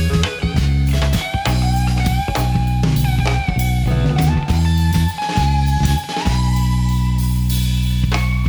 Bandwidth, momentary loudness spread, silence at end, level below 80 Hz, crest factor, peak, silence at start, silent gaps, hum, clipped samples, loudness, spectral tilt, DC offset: over 20 kHz; 2 LU; 0 s; -20 dBFS; 14 dB; 0 dBFS; 0 s; none; 60 Hz at -35 dBFS; under 0.1%; -17 LUFS; -6 dB/octave; under 0.1%